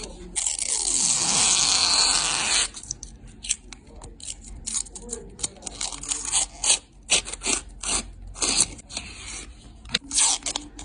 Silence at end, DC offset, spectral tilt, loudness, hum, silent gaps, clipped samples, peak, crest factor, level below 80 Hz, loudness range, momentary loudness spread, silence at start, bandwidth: 0 s; under 0.1%; 0.5 dB/octave; -22 LUFS; none; none; under 0.1%; -2 dBFS; 24 dB; -46 dBFS; 9 LU; 19 LU; 0 s; 11 kHz